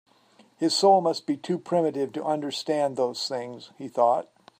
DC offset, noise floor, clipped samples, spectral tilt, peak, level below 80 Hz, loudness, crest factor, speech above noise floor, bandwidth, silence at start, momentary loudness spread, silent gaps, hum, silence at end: under 0.1%; -59 dBFS; under 0.1%; -4.5 dB/octave; -8 dBFS; -80 dBFS; -25 LUFS; 18 dB; 34 dB; 15.5 kHz; 0.6 s; 12 LU; none; none; 0.35 s